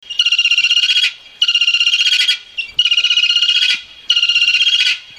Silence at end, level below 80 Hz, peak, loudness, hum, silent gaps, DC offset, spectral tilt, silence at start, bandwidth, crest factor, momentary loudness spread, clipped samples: 0.05 s; -62 dBFS; 0 dBFS; -11 LUFS; none; none; under 0.1%; 4.5 dB/octave; 0.1 s; 14.5 kHz; 14 dB; 5 LU; under 0.1%